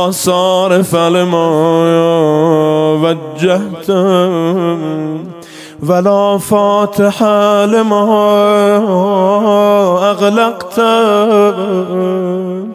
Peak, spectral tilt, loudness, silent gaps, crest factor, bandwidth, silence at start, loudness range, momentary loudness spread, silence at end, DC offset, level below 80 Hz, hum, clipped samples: 0 dBFS; -6 dB/octave; -11 LUFS; none; 10 dB; 16 kHz; 0 s; 3 LU; 6 LU; 0 s; under 0.1%; -56 dBFS; none; under 0.1%